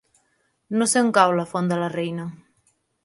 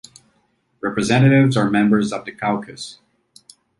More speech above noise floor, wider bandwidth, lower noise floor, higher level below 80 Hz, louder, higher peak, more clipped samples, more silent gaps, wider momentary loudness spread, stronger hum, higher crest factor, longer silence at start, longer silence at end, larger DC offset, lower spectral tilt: about the same, 47 dB vs 47 dB; about the same, 11.5 kHz vs 11.5 kHz; first, -69 dBFS vs -64 dBFS; second, -70 dBFS vs -56 dBFS; second, -21 LUFS vs -18 LUFS; first, 0 dBFS vs -4 dBFS; neither; neither; second, 12 LU vs 18 LU; neither; first, 22 dB vs 16 dB; second, 0.7 s vs 0.85 s; second, 0.7 s vs 0.9 s; neither; second, -4.5 dB/octave vs -6.5 dB/octave